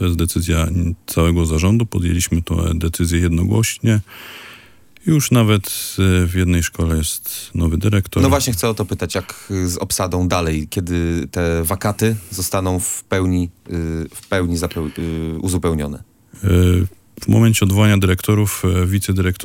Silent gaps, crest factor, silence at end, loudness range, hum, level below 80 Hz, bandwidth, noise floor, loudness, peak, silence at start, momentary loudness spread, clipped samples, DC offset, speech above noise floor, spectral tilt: none; 16 dB; 0 s; 4 LU; none; -34 dBFS; 17 kHz; -46 dBFS; -18 LUFS; -2 dBFS; 0 s; 9 LU; under 0.1%; under 0.1%; 29 dB; -5.5 dB/octave